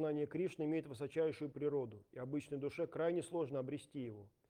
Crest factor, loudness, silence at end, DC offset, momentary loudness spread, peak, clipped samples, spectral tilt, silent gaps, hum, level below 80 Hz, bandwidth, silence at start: 14 dB; -42 LUFS; 0.2 s; under 0.1%; 9 LU; -26 dBFS; under 0.1%; -7 dB/octave; none; none; -80 dBFS; 12 kHz; 0 s